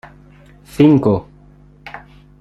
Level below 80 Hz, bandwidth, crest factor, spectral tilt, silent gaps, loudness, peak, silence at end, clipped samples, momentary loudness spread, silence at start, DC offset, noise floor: -46 dBFS; 12.5 kHz; 16 dB; -8.5 dB/octave; none; -14 LUFS; -2 dBFS; 0.4 s; under 0.1%; 24 LU; 0.8 s; under 0.1%; -45 dBFS